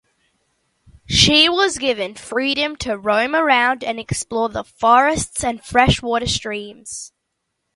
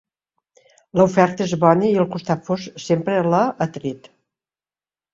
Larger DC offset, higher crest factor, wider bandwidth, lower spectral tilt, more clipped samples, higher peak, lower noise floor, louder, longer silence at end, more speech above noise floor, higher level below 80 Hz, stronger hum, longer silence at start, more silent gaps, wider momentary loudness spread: neither; about the same, 20 dB vs 20 dB; first, 11.5 kHz vs 7.6 kHz; second, -3 dB/octave vs -7 dB/octave; neither; about the same, 0 dBFS vs 0 dBFS; second, -75 dBFS vs under -90 dBFS; about the same, -17 LUFS vs -19 LUFS; second, 0.7 s vs 1.15 s; second, 57 dB vs over 72 dB; first, -40 dBFS vs -58 dBFS; neither; first, 1.1 s vs 0.95 s; neither; first, 15 LU vs 11 LU